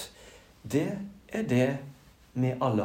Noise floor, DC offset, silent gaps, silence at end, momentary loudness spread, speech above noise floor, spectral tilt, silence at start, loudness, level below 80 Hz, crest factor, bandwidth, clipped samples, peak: -53 dBFS; under 0.1%; none; 0 s; 16 LU; 25 dB; -7 dB/octave; 0 s; -30 LUFS; -62 dBFS; 16 dB; 16 kHz; under 0.1%; -14 dBFS